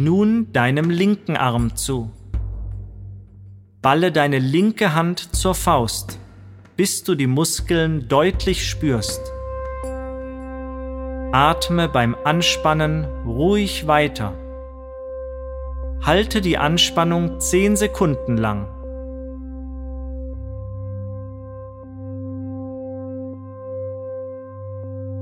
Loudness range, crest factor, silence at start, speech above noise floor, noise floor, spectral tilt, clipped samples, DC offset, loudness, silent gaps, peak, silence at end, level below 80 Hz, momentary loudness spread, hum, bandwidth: 13 LU; 20 dB; 0 s; 24 dB; -42 dBFS; -5 dB/octave; under 0.1%; under 0.1%; -20 LUFS; none; 0 dBFS; 0 s; -34 dBFS; 17 LU; none; 16.5 kHz